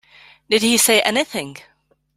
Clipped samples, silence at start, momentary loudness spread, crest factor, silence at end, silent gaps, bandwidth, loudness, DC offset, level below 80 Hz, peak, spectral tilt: under 0.1%; 0.5 s; 14 LU; 20 dB; 0.65 s; none; 16 kHz; -16 LUFS; under 0.1%; -60 dBFS; 0 dBFS; -1.5 dB/octave